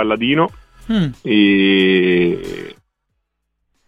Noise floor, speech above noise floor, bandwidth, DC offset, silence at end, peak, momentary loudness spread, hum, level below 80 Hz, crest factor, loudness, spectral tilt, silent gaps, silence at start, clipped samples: -72 dBFS; 58 dB; 8.2 kHz; 0.1%; 1.15 s; -2 dBFS; 15 LU; none; -46 dBFS; 14 dB; -15 LUFS; -7 dB/octave; none; 0 s; under 0.1%